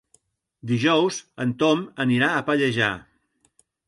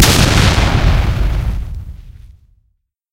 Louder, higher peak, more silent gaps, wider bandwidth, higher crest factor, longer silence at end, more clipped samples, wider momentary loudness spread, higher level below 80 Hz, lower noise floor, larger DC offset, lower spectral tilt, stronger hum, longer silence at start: second, -22 LUFS vs -13 LUFS; second, -6 dBFS vs 0 dBFS; neither; second, 11.5 kHz vs 17 kHz; about the same, 18 dB vs 14 dB; about the same, 0.9 s vs 1 s; second, under 0.1% vs 0.1%; second, 8 LU vs 19 LU; second, -62 dBFS vs -18 dBFS; first, -67 dBFS vs -63 dBFS; neither; about the same, -5 dB/octave vs -4 dB/octave; neither; first, 0.65 s vs 0 s